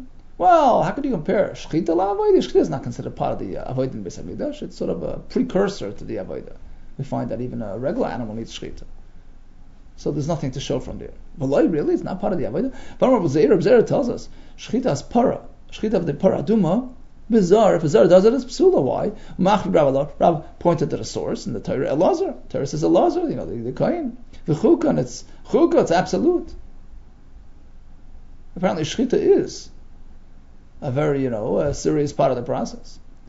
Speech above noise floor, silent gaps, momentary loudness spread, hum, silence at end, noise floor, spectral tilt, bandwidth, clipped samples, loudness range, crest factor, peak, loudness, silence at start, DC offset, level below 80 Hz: 22 dB; none; 14 LU; none; 0.1 s; -42 dBFS; -7 dB/octave; 8 kHz; under 0.1%; 10 LU; 20 dB; -2 dBFS; -20 LUFS; 0 s; under 0.1%; -40 dBFS